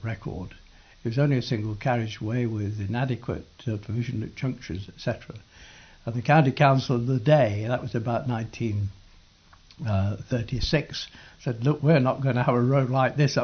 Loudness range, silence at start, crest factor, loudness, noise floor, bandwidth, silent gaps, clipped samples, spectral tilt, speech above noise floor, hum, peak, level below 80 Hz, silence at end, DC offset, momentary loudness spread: 7 LU; 0 s; 18 dB; -26 LUFS; -55 dBFS; 6.6 kHz; none; under 0.1%; -7 dB/octave; 30 dB; none; -8 dBFS; -48 dBFS; 0 s; under 0.1%; 14 LU